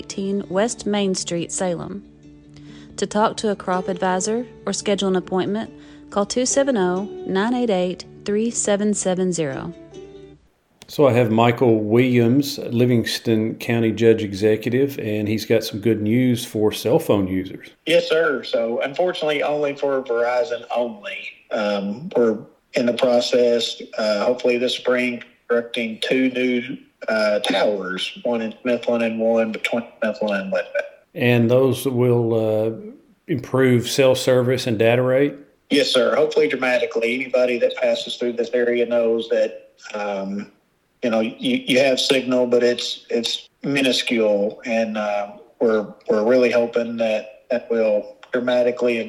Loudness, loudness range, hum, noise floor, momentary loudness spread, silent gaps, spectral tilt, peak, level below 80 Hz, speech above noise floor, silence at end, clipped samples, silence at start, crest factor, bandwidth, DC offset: -20 LUFS; 4 LU; none; -54 dBFS; 10 LU; none; -5 dB/octave; 0 dBFS; -60 dBFS; 34 dB; 0 s; under 0.1%; 0 s; 20 dB; 17 kHz; under 0.1%